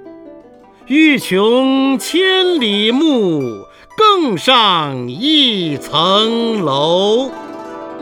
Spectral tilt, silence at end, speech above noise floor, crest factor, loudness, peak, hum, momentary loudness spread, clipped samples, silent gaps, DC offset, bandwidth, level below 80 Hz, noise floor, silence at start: -4.5 dB/octave; 0 s; 28 dB; 14 dB; -13 LUFS; 0 dBFS; none; 14 LU; under 0.1%; none; under 0.1%; 18.5 kHz; -58 dBFS; -41 dBFS; 0 s